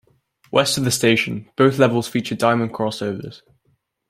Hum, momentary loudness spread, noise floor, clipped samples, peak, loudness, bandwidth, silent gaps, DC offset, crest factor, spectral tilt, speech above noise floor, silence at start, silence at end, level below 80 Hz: none; 11 LU; -66 dBFS; under 0.1%; -2 dBFS; -19 LUFS; 16 kHz; none; under 0.1%; 18 dB; -4.5 dB/octave; 47 dB; 0.55 s; 0.7 s; -58 dBFS